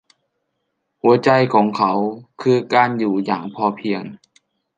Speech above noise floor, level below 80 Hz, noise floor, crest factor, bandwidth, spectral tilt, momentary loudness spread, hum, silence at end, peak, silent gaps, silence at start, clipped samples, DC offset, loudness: 56 dB; -66 dBFS; -74 dBFS; 18 dB; 9 kHz; -7 dB/octave; 10 LU; none; 0.6 s; -2 dBFS; none; 1.05 s; under 0.1%; under 0.1%; -18 LUFS